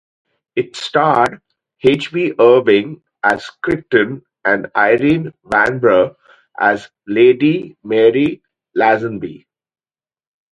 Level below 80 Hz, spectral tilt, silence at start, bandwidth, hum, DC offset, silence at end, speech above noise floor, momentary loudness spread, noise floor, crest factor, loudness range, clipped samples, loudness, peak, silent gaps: -52 dBFS; -6.5 dB/octave; 0.55 s; 10.5 kHz; none; under 0.1%; 1.15 s; over 76 dB; 11 LU; under -90 dBFS; 16 dB; 1 LU; under 0.1%; -15 LUFS; 0 dBFS; none